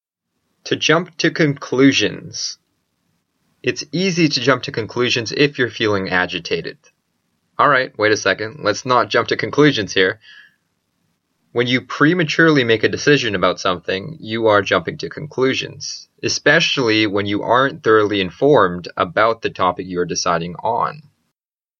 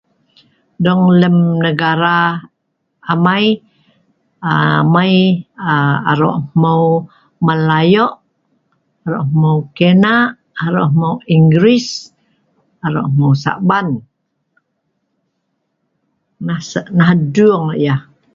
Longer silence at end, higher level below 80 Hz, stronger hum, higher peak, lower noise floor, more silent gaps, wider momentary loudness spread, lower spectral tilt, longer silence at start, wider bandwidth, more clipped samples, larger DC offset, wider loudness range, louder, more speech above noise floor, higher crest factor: first, 0.8 s vs 0.35 s; about the same, -58 dBFS vs -54 dBFS; neither; about the same, 0 dBFS vs 0 dBFS; first, -80 dBFS vs -69 dBFS; neither; about the same, 11 LU vs 11 LU; second, -4.5 dB/octave vs -7 dB/octave; second, 0.65 s vs 0.8 s; about the same, 7.4 kHz vs 7.2 kHz; neither; neither; about the same, 3 LU vs 5 LU; second, -17 LUFS vs -13 LUFS; first, 63 dB vs 57 dB; about the same, 18 dB vs 14 dB